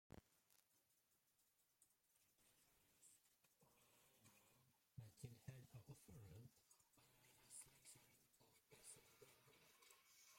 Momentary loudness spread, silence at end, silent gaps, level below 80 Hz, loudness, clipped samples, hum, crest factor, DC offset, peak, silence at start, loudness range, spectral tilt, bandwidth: 7 LU; 0 s; none; -86 dBFS; -64 LUFS; under 0.1%; none; 24 dB; under 0.1%; -44 dBFS; 0.1 s; 2 LU; -4 dB/octave; 16.5 kHz